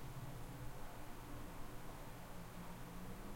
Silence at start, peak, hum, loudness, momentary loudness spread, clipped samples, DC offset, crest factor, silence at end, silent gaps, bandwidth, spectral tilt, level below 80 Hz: 0 s; -36 dBFS; none; -53 LUFS; 2 LU; under 0.1%; under 0.1%; 12 dB; 0 s; none; 16.5 kHz; -5.5 dB/octave; -56 dBFS